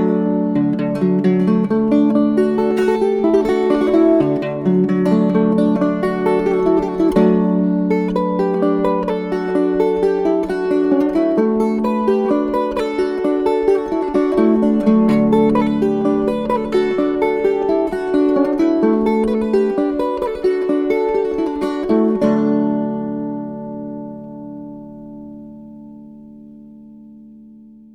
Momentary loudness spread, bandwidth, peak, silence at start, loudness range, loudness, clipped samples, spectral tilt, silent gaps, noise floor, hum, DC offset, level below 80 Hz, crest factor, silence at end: 10 LU; 11 kHz; -4 dBFS; 0 s; 6 LU; -16 LUFS; under 0.1%; -8.5 dB/octave; none; -42 dBFS; none; under 0.1%; -46 dBFS; 14 dB; 0.45 s